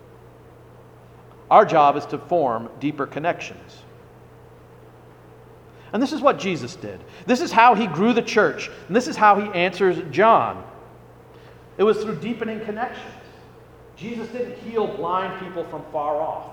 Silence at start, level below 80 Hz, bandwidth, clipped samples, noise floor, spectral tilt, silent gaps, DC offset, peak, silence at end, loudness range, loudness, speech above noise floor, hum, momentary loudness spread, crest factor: 1.5 s; -58 dBFS; 18 kHz; under 0.1%; -46 dBFS; -5.5 dB/octave; none; under 0.1%; 0 dBFS; 0 s; 10 LU; -21 LUFS; 26 dB; none; 18 LU; 22 dB